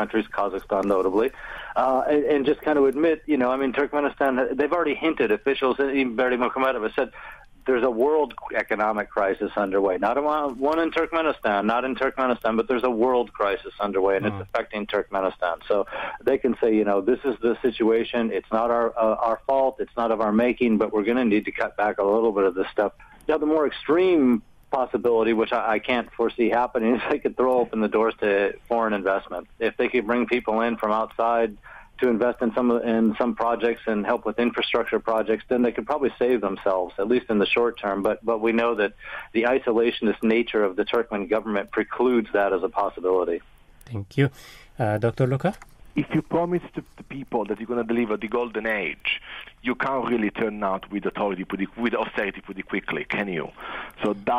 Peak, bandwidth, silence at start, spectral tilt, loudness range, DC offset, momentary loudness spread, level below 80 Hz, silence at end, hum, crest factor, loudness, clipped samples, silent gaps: -8 dBFS; 13.5 kHz; 0 s; -7.5 dB/octave; 4 LU; under 0.1%; 7 LU; -52 dBFS; 0 s; none; 16 dB; -24 LUFS; under 0.1%; none